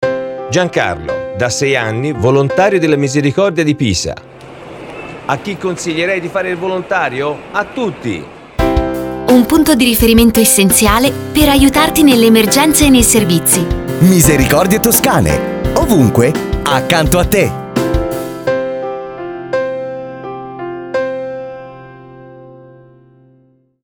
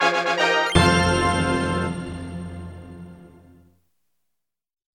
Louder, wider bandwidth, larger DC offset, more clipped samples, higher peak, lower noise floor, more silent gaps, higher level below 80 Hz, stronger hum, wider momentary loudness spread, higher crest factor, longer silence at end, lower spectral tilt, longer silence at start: first, -12 LUFS vs -20 LUFS; first, over 20 kHz vs 13.5 kHz; neither; first, 0.1% vs under 0.1%; about the same, 0 dBFS vs 0 dBFS; second, -51 dBFS vs -84 dBFS; neither; first, -28 dBFS vs -40 dBFS; neither; second, 16 LU vs 22 LU; second, 12 dB vs 22 dB; second, 1.25 s vs 1.75 s; about the same, -4.5 dB/octave vs -4.5 dB/octave; about the same, 0 s vs 0 s